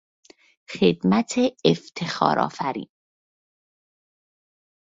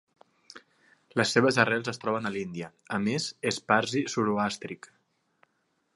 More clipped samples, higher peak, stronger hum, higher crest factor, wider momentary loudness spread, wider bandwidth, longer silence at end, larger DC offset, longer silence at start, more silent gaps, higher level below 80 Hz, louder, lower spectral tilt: neither; first, -2 dBFS vs -6 dBFS; neither; about the same, 24 dB vs 24 dB; about the same, 12 LU vs 14 LU; second, 8 kHz vs 11.5 kHz; first, 2 s vs 1.2 s; neither; first, 0.7 s vs 0.55 s; neither; first, -62 dBFS vs -68 dBFS; first, -22 LUFS vs -28 LUFS; about the same, -5.5 dB/octave vs -4.5 dB/octave